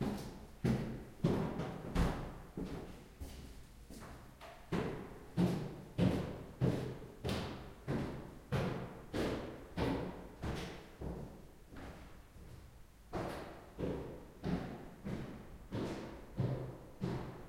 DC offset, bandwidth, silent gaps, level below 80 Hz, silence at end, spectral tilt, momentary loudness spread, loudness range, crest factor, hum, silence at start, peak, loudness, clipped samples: under 0.1%; 16.5 kHz; none; -52 dBFS; 0 s; -7 dB/octave; 17 LU; 8 LU; 22 dB; none; 0 s; -20 dBFS; -41 LUFS; under 0.1%